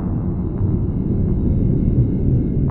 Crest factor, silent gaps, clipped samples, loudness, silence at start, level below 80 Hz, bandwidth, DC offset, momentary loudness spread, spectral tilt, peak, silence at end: 14 dB; none; under 0.1%; -19 LUFS; 0 s; -24 dBFS; 2.8 kHz; under 0.1%; 4 LU; -14 dB/octave; -4 dBFS; 0 s